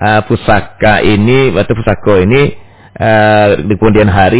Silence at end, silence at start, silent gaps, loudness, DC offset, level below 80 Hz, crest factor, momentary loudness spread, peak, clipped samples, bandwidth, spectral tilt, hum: 0 s; 0 s; none; -9 LUFS; under 0.1%; -26 dBFS; 8 dB; 5 LU; 0 dBFS; 0.7%; 4 kHz; -11 dB/octave; none